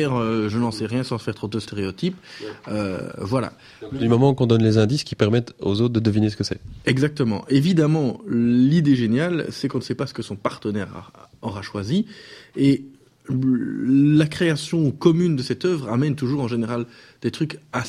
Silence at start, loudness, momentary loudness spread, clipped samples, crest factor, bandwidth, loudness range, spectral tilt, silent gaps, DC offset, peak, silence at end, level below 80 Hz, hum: 0 s; -21 LUFS; 12 LU; under 0.1%; 18 dB; 13 kHz; 6 LU; -7 dB/octave; none; under 0.1%; -2 dBFS; 0 s; -52 dBFS; none